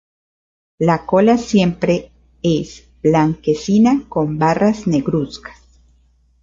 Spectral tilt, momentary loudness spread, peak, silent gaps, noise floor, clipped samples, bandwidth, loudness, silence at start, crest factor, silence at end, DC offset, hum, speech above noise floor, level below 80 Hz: -7 dB/octave; 8 LU; -2 dBFS; none; -55 dBFS; under 0.1%; 7.6 kHz; -16 LUFS; 0.8 s; 14 dB; 0.9 s; under 0.1%; none; 40 dB; -46 dBFS